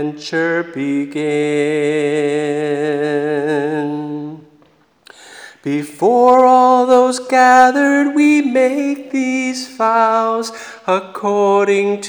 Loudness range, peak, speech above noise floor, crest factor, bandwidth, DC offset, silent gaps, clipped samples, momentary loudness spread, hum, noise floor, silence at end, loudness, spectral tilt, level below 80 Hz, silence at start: 9 LU; 0 dBFS; 39 dB; 14 dB; over 20 kHz; under 0.1%; none; under 0.1%; 12 LU; none; -52 dBFS; 0 s; -14 LUFS; -5 dB/octave; -68 dBFS; 0 s